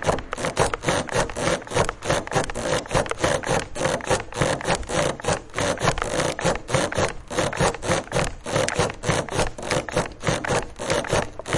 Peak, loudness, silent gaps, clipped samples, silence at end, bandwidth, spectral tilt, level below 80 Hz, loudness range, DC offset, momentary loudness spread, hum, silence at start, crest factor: -2 dBFS; -24 LUFS; none; under 0.1%; 0 s; 11.5 kHz; -4 dB/octave; -38 dBFS; 1 LU; under 0.1%; 3 LU; none; 0 s; 22 dB